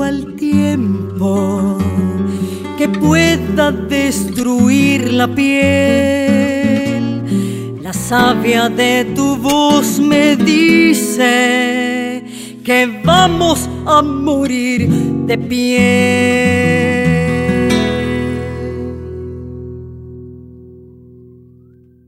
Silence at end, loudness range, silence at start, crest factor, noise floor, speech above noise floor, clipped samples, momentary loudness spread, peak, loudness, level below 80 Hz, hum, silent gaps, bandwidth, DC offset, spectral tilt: 1.25 s; 7 LU; 0 s; 14 dB; -45 dBFS; 32 dB; under 0.1%; 12 LU; 0 dBFS; -13 LUFS; -38 dBFS; none; none; 16 kHz; under 0.1%; -5 dB/octave